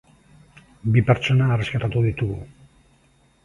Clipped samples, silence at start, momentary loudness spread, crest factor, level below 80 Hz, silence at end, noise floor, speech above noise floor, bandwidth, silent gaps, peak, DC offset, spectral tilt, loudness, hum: under 0.1%; 0.85 s; 10 LU; 22 dB; -46 dBFS; 1 s; -59 dBFS; 39 dB; 7.2 kHz; none; -2 dBFS; under 0.1%; -7.5 dB/octave; -21 LUFS; none